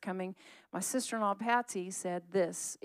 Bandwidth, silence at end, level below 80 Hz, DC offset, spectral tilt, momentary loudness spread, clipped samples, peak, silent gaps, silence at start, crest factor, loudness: 15.5 kHz; 0.1 s; under -90 dBFS; under 0.1%; -3.5 dB/octave; 10 LU; under 0.1%; -18 dBFS; none; 0 s; 18 dB; -35 LUFS